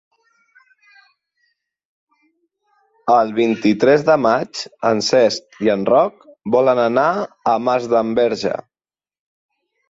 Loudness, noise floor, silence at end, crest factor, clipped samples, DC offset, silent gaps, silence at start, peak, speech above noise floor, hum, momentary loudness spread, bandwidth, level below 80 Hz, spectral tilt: -17 LUFS; under -90 dBFS; 1.3 s; 16 dB; under 0.1%; under 0.1%; none; 3.05 s; -2 dBFS; over 74 dB; none; 8 LU; 7.8 kHz; -60 dBFS; -5 dB/octave